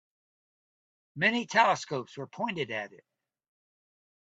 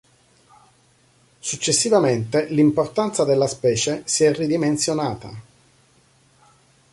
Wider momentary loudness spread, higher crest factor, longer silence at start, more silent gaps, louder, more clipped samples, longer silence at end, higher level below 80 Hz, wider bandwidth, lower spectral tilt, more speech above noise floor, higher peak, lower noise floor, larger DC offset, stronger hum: first, 18 LU vs 11 LU; first, 26 dB vs 16 dB; second, 1.15 s vs 1.45 s; neither; second, -29 LUFS vs -20 LUFS; neither; second, 1.35 s vs 1.5 s; second, -80 dBFS vs -58 dBFS; second, 8.4 kHz vs 11.5 kHz; about the same, -4 dB/octave vs -4 dB/octave; first, over 60 dB vs 38 dB; about the same, -8 dBFS vs -6 dBFS; first, under -90 dBFS vs -58 dBFS; neither; neither